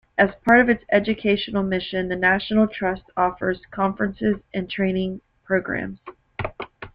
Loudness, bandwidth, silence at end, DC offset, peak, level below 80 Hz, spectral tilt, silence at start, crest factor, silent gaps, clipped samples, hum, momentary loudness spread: -22 LUFS; 5.4 kHz; 0.05 s; under 0.1%; -2 dBFS; -48 dBFS; -8 dB/octave; 0.2 s; 20 dB; none; under 0.1%; none; 15 LU